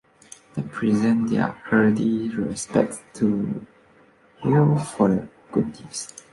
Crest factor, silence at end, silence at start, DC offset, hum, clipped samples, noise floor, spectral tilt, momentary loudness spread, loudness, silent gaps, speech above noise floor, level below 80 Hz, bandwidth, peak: 18 dB; 0.25 s; 0.55 s; under 0.1%; none; under 0.1%; -55 dBFS; -6.5 dB/octave; 13 LU; -23 LUFS; none; 33 dB; -56 dBFS; 11.5 kHz; -4 dBFS